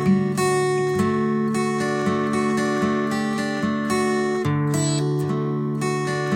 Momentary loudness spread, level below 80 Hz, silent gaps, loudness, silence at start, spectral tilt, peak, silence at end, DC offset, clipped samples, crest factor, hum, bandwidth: 3 LU; -58 dBFS; none; -22 LUFS; 0 s; -6 dB/octave; -8 dBFS; 0 s; under 0.1%; under 0.1%; 12 dB; none; 16.5 kHz